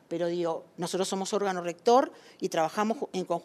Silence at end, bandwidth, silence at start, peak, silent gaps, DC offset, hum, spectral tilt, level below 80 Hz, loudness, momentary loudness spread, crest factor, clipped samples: 0 s; 13.5 kHz; 0.1 s; -10 dBFS; none; under 0.1%; none; -4.5 dB/octave; -84 dBFS; -29 LUFS; 10 LU; 18 dB; under 0.1%